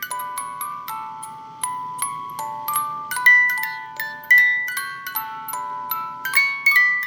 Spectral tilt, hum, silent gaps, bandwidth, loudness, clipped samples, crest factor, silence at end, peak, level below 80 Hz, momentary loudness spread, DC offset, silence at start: 0.5 dB/octave; none; none; over 20 kHz; -19 LUFS; under 0.1%; 20 dB; 0 s; -2 dBFS; -72 dBFS; 17 LU; under 0.1%; 0 s